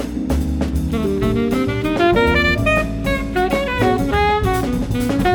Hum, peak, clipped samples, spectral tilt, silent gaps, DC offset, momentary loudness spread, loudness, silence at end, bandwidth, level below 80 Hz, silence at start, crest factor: none; -2 dBFS; under 0.1%; -6.5 dB/octave; none; under 0.1%; 6 LU; -18 LUFS; 0 s; 19 kHz; -26 dBFS; 0 s; 14 dB